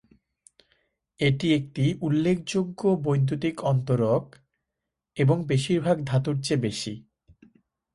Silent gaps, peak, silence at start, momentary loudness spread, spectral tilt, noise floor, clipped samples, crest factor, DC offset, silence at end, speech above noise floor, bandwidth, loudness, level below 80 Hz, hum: none; -10 dBFS; 1.2 s; 5 LU; -6.5 dB/octave; -85 dBFS; under 0.1%; 16 dB; under 0.1%; 0.95 s; 61 dB; 11.5 kHz; -25 LUFS; -58 dBFS; none